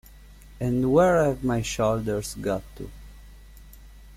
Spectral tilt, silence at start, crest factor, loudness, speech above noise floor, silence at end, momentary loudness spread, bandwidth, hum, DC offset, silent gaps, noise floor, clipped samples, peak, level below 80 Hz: -6 dB/octave; 0.2 s; 18 dB; -24 LUFS; 24 dB; 0 s; 17 LU; 16 kHz; none; under 0.1%; none; -47 dBFS; under 0.1%; -8 dBFS; -44 dBFS